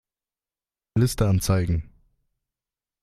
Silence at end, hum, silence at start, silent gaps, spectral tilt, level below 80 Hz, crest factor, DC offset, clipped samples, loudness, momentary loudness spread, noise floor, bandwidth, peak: 1.2 s; none; 0.95 s; none; -6 dB/octave; -40 dBFS; 18 dB; under 0.1%; under 0.1%; -24 LUFS; 8 LU; under -90 dBFS; 14.5 kHz; -8 dBFS